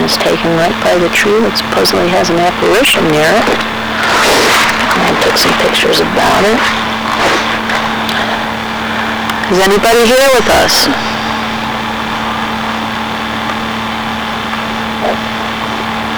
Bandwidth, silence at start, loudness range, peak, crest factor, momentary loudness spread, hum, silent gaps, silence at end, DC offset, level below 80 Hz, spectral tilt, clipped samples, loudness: over 20 kHz; 0 s; 7 LU; -6 dBFS; 6 dB; 9 LU; none; none; 0 s; under 0.1%; -36 dBFS; -3 dB/octave; under 0.1%; -11 LUFS